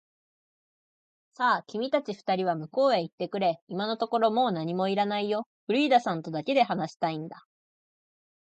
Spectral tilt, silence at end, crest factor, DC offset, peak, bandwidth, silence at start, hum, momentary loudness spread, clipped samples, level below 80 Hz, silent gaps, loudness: -6 dB/octave; 1.15 s; 20 dB; under 0.1%; -10 dBFS; 8.6 kHz; 1.4 s; none; 7 LU; under 0.1%; -80 dBFS; 3.13-3.18 s, 3.62-3.67 s, 5.46-5.67 s, 6.96-7.00 s; -28 LUFS